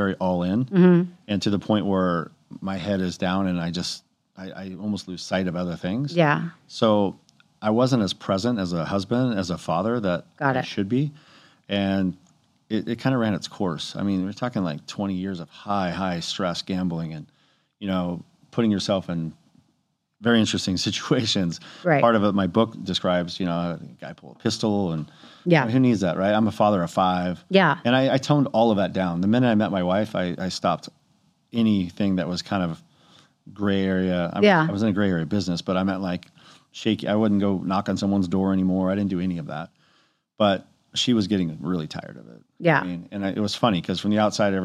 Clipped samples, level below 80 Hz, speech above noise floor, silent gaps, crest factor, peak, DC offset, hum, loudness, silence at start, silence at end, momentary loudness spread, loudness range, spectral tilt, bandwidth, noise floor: under 0.1%; -60 dBFS; 49 dB; none; 20 dB; -2 dBFS; under 0.1%; none; -23 LUFS; 0 s; 0 s; 11 LU; 6 LU; -6 dB/octave; 11 kHz; -72 dBFS